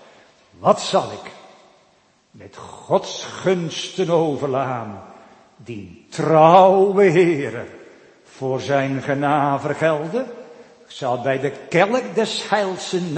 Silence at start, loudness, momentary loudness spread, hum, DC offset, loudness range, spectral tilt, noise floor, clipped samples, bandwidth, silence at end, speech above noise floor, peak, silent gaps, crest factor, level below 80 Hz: 0.6 s; -19 LUFS; 21 LU; none; under 0.1%; 7 LU; -5.5 dB/octave; -58 dBFS; under 0.1%; 8.8 kHz; 0 s; 39 dB; 0 dBFS; none; 20 dB; -66 dBFS